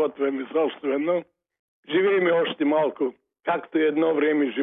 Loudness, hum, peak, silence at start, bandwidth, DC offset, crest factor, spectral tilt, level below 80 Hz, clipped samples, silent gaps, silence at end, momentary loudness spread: -24 LUFS; none; -12 dBFS; 0 s; 3.9 kHz; under 0.1%; 12 dB; -9.5 dB/octave; -80 dBFS; under 0.1%; 1.59-1.83 s; 0 s; 7 LU